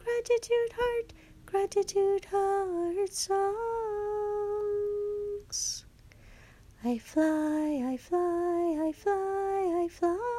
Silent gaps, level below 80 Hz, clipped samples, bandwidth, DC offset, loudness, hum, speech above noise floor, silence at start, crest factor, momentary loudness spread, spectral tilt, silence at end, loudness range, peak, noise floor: none; -58 dBFS; under 0.1%; 14.5 kHz; under 0.1%; -30 LUFS; none; 25 dB; 0 s; 14 dB; 6 LU; -3.5 dB/octave; 0 s; 4 LU; -16 dBFS; -54 dBFS